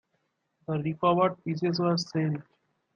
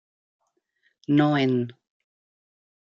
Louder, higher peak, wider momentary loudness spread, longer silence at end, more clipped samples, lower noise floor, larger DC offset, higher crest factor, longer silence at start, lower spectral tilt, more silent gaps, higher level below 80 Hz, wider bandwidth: second, -28 LUFS vs -23 LUFS; about the same, -10 dBFS vs -8 dBFS; second, 10 LU vs 15 LU; second, 0.55 s vs 1.1 s; neither; first, -76 dBFS vs -71 dBFS; neither; about the same, 18 dB vs 18 dB; second, 0.7 s vs 1.1 s; second, -6.5 dB/octave vs -8.5 dB/octave; neither; about the same, -68 dBFS vs -72 dBFS; about the same, 7.4 kHz vs 6.8 kHz